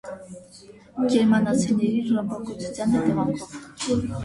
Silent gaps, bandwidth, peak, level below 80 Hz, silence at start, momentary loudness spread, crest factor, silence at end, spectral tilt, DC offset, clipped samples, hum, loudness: none; 11.5 kHz; -8 dBFS; -52 dBFS; 0.05 s; 19 LU; 16 dB; 0 s; -6 dB/octave; under 0.1%; under 0.1%; none; -23 LUFS